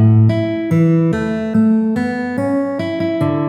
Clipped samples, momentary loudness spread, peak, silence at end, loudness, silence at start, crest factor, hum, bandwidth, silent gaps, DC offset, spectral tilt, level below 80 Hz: under 0.1%; 6 LU; -2 dBFS; 0 s; -16 LUFS; 0 s; 12 dB; none; 9.2 kHz; none; under 0.1%; -9 dB/octave; -48 dBFS